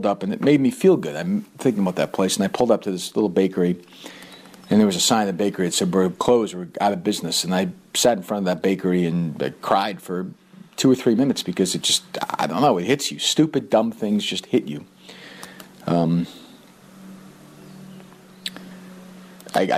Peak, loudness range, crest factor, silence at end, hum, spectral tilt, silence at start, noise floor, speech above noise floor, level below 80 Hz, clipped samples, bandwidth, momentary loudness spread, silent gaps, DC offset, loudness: -4 dBFS; 8 LU; 18 dB; 0 s; none; -4.5 dB/octave; 0 s; -47 dBFS; 26 dB; -62 dBFS; under 0.1%; 15.5 kHz; 20 LU; none; under 0.1%; -21 LUFS